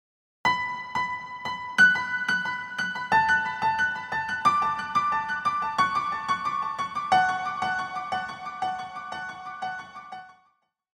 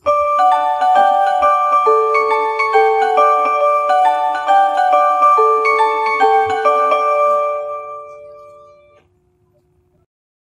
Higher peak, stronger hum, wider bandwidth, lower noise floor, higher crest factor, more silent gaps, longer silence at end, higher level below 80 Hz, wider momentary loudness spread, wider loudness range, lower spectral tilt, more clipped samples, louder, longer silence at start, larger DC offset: second, -8 dBFS vs 0 dBFS; neither; first, 13.5 kHz vs 10.5 kHz; first, -69 dBFS vs -58 dBFS; about the same, 18 dB vs 14 dB; neither; second, 0.65 s vs 2.1 s; about the same, -64 dBFS vs -60 dBFS; first, 14 LU vs 4 LU; about the same, 5 LU vs 7 LU; about the same, -2.5 dB/octave vs -2.5 dB/octave; neither; second, -26 LUFS vs -13 LUFS; first, 0.45 s vs 0.05 s; neither